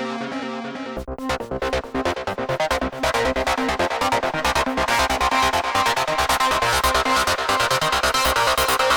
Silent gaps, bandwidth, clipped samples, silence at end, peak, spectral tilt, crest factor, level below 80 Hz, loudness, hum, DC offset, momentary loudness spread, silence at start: none; over 20 kHz; under 0.1%; 0 s; -6 dBFS; -2.5 dB/octave; 16 dB; -38 dBFS; -20 LUFS; none; under 0.1%; 9 LU; 0 s